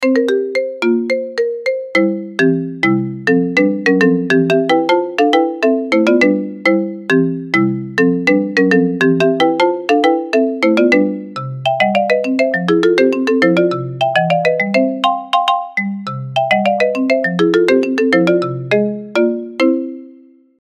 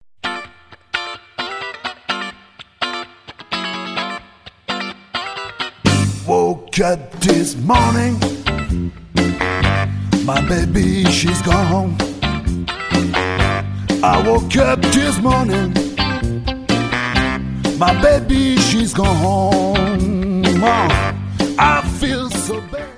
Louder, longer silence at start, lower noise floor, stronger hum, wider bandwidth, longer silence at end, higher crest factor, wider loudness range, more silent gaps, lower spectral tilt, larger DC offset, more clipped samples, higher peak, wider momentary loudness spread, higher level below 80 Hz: first, -14 LUFS vs -17 LUFS; second, 0 s vs 0.25 s; about the same, -43 dBFS vs -42 dBFS; neither; about the same, 11 kHz vs 11 kHz; first, 0.5 s vs 0 s; about the same, 14 dB vs 16 dB; second, 2 LU vs 10 LU; neither; first, -6.5 dB/octave vs -5 dB/octave; neither; neither; about the same, 0 dBFS vs 0 dBFS; second, 6 LU vs 12 LU; second, -64 dBFS vs -28 dBFS